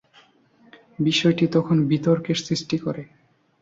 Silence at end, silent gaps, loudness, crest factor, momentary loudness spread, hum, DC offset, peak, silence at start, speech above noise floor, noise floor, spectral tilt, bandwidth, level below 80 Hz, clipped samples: 0.55 s; none; -22 LUFS; 16 dB; 8 LU; none; under 0.1%; -6 dBFS; 1 s; 35 dB; -57 dBFS; -6 dB/octave; 7.8 kHz; -60 dBFS; under 0.1%